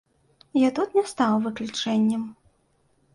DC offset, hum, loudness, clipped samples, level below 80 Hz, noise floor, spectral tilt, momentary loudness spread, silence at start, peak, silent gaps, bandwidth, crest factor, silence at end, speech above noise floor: under 0.1%; none; -24 LUFS; under 0.1%; -66 dBFS; -66 dBFS; -5 dB/octave; 7 LU; 0.55 s; -10 dBFS; none; 11.5 kHz; 16 dB; 0.85 s; 43 dB